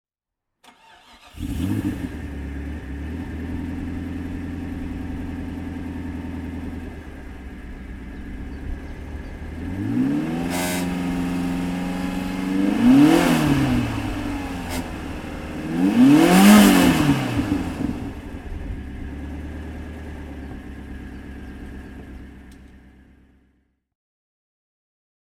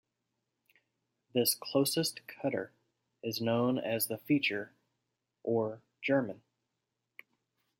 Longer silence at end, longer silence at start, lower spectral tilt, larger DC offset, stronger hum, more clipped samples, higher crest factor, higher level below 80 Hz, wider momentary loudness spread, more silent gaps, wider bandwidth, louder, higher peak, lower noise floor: first, 2.45 s vs 1.45 s; second, 0.65 s vs 1.35 s; first, -5.5 dB/octave vs -4 dB/octave; neither; neither; neither; about the same, 22 dB vs 20 dB; first, -36 dBFS vs -80 dBFS; first, 23 LU vs 12 LU; neither; first, 19 kHz vs 16.5 kHz; first, -21 LUFS vs -33 LUFS; first, -2 dBFS vs -14 dBFS; about the same, -83 dBFS vs -86 dBFS